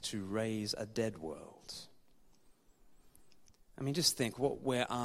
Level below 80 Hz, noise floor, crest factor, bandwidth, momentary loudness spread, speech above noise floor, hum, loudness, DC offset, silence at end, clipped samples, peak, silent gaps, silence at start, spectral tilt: -66 dBFS; -65 dBFS; 24 dB; 16 kHz; 17 LU; 28 dB; none; -36 LUFS; under 0.1%; 0 s; under 0.1%; -16 dBFS; none; 0 s; -4 dB/octave